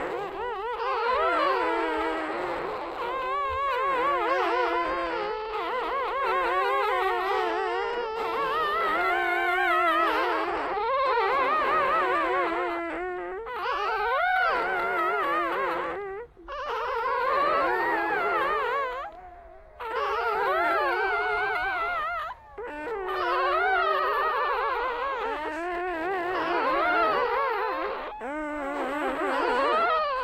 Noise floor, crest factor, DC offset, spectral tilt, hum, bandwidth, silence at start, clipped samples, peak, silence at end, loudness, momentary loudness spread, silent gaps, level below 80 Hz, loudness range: -47 dBFS; 16 dB; under 0.1%; -4 dB/octave; none; 15 kHz; 0 s; under 0.1%; -12 dBFS; 0 s; -26 LUFS; 9 LU; none; -54 dBFS; 3 LU